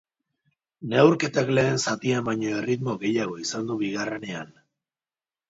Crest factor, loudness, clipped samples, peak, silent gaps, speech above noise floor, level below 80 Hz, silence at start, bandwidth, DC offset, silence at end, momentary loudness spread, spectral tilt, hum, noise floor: 22 dB; -24 LUFS; under 0.1%; -4 dBFS; none; over 66 dB; -64 dBFS; 0.8 s; 7.8 kHz; under 0.1%; 1.05 s; 14 LU; -5 dB/octave; none; under -90 dBFS